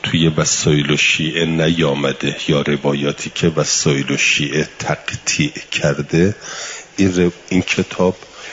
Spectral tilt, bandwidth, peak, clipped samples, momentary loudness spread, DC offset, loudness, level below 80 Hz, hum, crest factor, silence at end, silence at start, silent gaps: -4 dB/octave; 7.8 kHz; -2 dBFS; under 0.1%; 7 LU; under 0.1%; -16 LUFS; -48 dBFS; none; 14 dB; 0 s; 0.05 s; none